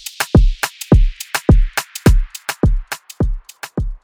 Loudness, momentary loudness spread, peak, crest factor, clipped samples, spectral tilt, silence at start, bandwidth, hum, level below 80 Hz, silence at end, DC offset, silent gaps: -17 LUFS; 11 LU; 0 dBFS; 14 dB; under 0.1%; -5.5 dB/octave; 0.05 s; 18 kHz; none; -18 dBFS; 0.05 s; under 0.1%; none